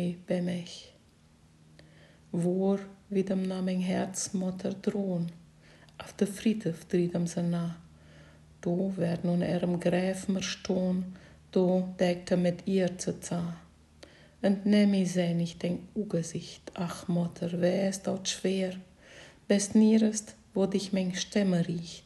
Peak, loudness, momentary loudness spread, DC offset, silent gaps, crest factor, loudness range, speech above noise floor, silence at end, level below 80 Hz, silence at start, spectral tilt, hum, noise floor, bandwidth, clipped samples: -12 dBFS; -30 LUFS; 12 LU; under 0.1%; none; 18 dB; 4 LU; 31 dB; 0.05 s; -62 dBFS; 0 s; -6 dB/octave; none; -60 dBFS; 12.5 kHz; under 0.1%